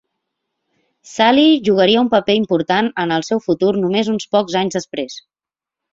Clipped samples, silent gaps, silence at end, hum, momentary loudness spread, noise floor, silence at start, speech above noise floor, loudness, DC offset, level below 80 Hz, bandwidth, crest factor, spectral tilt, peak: under 0.1%; none; 0.75 s; none; 13 LU; -88 dBFS; 1.05 s; 72 dB; -16 LUFS; under 0.1%; -58 dBFS; 7.8 kHz; 16 dB; -5 dB/octave; -2 dBFS